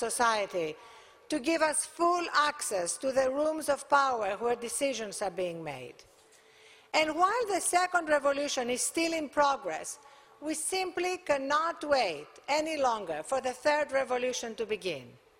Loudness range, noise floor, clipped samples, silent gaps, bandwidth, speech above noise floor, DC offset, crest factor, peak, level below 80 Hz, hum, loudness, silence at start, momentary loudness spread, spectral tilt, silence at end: 3 LU; -60 dBFS; under 0.1%; none; 16 kHz; 30 dB; under 0.1%; 20 dB; -12 dBFS; -68 dBFS; none; -30 LUFS; 0 s; 10 LU; -2 dB/octave; 0.25 s